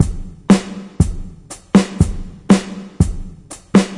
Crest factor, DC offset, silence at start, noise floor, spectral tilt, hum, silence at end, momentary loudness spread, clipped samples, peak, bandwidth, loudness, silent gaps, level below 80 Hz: 16 dB; under 0.1%; 0 s; -36 dBFS; -6.5 dB/octave; none; 0 s; 19 LU; under 0.1%; 0 dBFS; 11.5 kHz; -16 LUFS; none; -28 dBFS